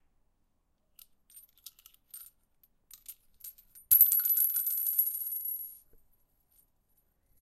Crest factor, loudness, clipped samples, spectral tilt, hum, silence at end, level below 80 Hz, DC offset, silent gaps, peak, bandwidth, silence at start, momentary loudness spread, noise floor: 28 dB; -25 LUFS; under 0.1%; 1.5 dB/octave; none; 1.7 s; -68 dBFS; under 0.1%; none; -6 dBFS; 16.5 kHz; 1.35 s; 28 LU; -74 dBFS